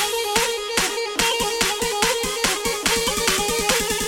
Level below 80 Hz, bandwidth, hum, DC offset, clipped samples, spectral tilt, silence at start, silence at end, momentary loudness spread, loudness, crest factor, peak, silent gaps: -42 dBFS; 17 kHz; none; under 0.1%; under 0.1%; -1 dB/octave; 0 s; 0 s; 2 LU; -20 LUFS; 18 dB; -4 dBFS; none